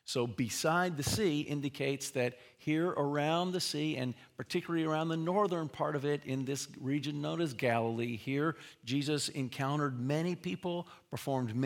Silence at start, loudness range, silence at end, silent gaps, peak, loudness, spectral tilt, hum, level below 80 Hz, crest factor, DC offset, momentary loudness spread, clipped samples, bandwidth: 0.05 s; 2 LU; 0 s; none; -16 dBFS; -34 LUFS; -5 dB/octave; none; -70 dBFS; 18 dB; under 0.1%; 7 LU; under 0.1%; 18 kHz